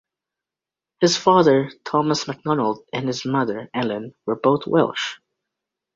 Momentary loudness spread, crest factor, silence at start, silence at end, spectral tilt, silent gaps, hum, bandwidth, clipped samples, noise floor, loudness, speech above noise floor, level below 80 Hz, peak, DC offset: 11 LU; 20 dB; 1 s; 0.8 s; -5 dB/octave; none; none; 7.8 kHz; under 0.1%; -88 dBFS; -21 LUFS; 68 dB; -62 dBFS; 0 dBFS; under 0.1%